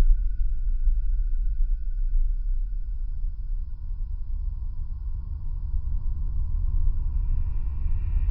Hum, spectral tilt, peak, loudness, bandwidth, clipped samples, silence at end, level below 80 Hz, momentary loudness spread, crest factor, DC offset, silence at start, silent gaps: none; -11.5 dB/octave; -8 dBFS; -32 LUFS; 1.5 kHz; under 0.1%; 0 s; -24 dBFS; 7 LU; 16 dB; under 0.1%; 0 s; none